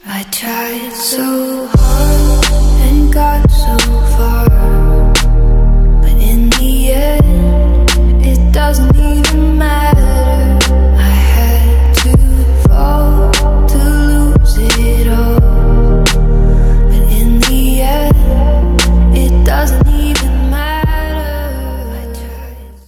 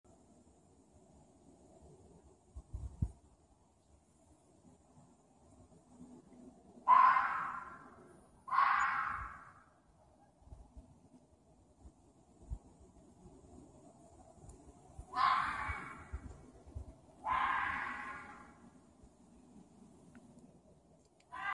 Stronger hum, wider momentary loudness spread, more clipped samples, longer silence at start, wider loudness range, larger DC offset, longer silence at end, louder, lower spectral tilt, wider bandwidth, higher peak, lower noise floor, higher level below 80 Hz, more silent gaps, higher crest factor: neither; second, 7 LU vs 28 LU; neither; second, 0.05 s vs 1.85 s; second, 2 LU vs 25 LU; neither; first, 0.15 s vs 0 s; first, -11 LUFS vs -35 LUFS; about the same, -5.5 dB/octave vs -4.5 dB/octave; first, 16 kHz vs 11 kHz; first, 0 dBFS vs -16 dBFS; second, -28 dBFS vs -69 dBFS; first, -10 dBFS vs -58 dBFS; neither; second, 8 dB vs 26 dB